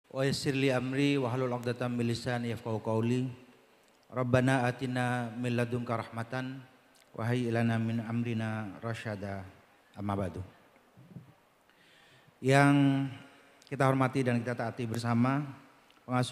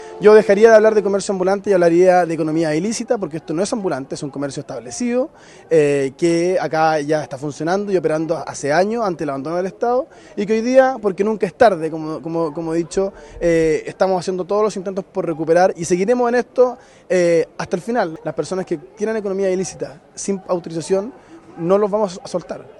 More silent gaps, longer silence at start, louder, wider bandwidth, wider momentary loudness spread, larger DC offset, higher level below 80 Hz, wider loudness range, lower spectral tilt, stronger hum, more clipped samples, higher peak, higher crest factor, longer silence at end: neither; first, 0.15 s vs 0 s; second, -31 LUFS vs -18 LUFS; first, 14 kHz vs 11.5 kHz; about the same, 14 LU vs 12 LU; neither; second, -68 dBFS vs -52 dBFS; first, 9 LU vs 5 LU; about the same, -6.5 dB/octave vs -5.5 dB/octave; neither; neither; second, -8 dBFS vs 0 dBFS; first, 24 dB vs 18 dB; about the same, 0 s vs 0.1 s